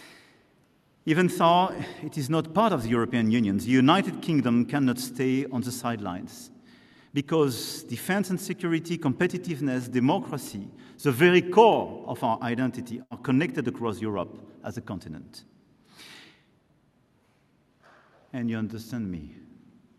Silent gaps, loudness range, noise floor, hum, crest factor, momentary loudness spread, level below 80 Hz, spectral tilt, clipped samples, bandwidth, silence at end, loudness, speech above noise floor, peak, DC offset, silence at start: none; 14 LU; -65 dBFS; none; 22 dB; 18 LU; -62 dBFS; -6 dB/octave; under 0.1%; 13.5 kHz; 0.6 s; -26 LUFS; 39 dB; -4 dBFS; under 0.1%; 0 s